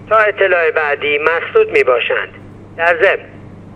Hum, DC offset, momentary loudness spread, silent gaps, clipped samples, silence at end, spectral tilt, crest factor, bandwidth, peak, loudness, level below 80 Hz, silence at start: none; under 0.1%; 8 LU; none; under 0.1%; 0 s; -5 dB/octave; 14 dB; 8.8 kHz; 0 dBFS; -13 LUFS; -50 dBFS; 0 s